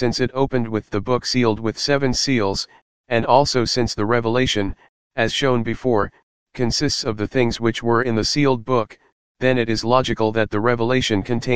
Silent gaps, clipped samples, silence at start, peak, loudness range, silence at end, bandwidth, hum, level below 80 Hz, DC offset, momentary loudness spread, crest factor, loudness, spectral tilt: 2.82-3.04 s, 4.89-5.10 s, 6.23-6.46 s, 9.12-9.35 s; under 0.1%; 0 s; 0 dBFS; 2 LU; 0 s; 15.5 kHz; none; -42 dBFS; 2%; 5 LU; 18 dB; -20 LUFS; -5 dB/octave